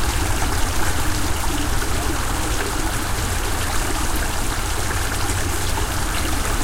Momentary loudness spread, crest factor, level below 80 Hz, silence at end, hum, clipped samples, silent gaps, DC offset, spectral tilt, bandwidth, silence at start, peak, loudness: 1 LU; 14 dB; -24 dBFS; 0 s; none; under 0.1%; none; under 0.1%; -3.5 dB/octave; 16.5 kHz; 0 s; -6 dBFS; -22 LUFS